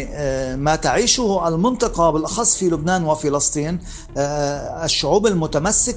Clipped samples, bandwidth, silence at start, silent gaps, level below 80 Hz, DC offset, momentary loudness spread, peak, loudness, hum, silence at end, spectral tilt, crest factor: under 0.1%; 10 kHz; 0 s; none; -36 dBFS; under 0.1%; 8 LU; -2 dBFS; -19 LUFS; none; 0 s; -3.5 dB/octave; 18 dB